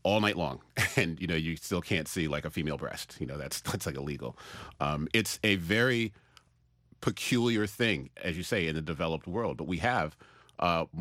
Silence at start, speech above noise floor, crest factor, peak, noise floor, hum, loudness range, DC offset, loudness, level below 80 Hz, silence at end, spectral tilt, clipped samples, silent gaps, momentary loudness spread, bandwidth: 0.05 s; 36 dB; 22 dB; -10 dBFS; -68 dBFS; none; 4 LU; under 0.1%; -31 LUFS; -54 dBFS; 0 s; -4.5 dB/octave; under 0.1%; none; 11 LU; 16 kHz